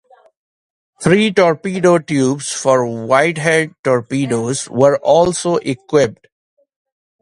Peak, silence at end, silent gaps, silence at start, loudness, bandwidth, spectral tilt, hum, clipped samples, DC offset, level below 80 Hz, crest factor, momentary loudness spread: 0 dBFS; 1.05 s; 3.79-3.84 s; 1 s; -15 LUFS; 11.5 kHz; -5 dB/octave; none; under 0.1%; under 0.1%; -52 dBFS; 16 dB; 6 LU